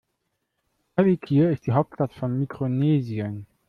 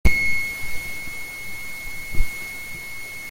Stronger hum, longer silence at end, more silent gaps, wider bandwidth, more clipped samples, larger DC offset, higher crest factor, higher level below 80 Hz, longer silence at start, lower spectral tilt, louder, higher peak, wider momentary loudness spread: neither; first, 0.25 s vs 0 s; neither; second, 6 kHz vs 17 kHz; neither; neither; about the same, 16 dB vs 18 dB; second, -60 dBFS vs -30 dBFS; first, 0.95 s vs 0.05 s; first, -10.5 dB/octave vs -3.5 dB/octave; first, -24 LUFS vs -27 LUFS; second, -8 dBFS vs -2 dBFS; about the same, 9 LU vs 11 LU